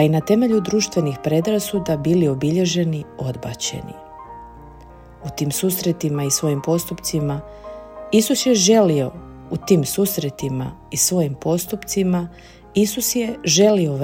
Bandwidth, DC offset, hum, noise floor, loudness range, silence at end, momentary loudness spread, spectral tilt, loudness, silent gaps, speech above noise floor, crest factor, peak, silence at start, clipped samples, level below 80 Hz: 16.5 kHz; under 0.1%; none; -42 dBFS; 5 LU; 0 s; 18 LU; -5 dB/octave; -19 LUFS; none; 23 dB; 18 dB; -2 dBFS; 0 s; under 0.1%; -48 dBFS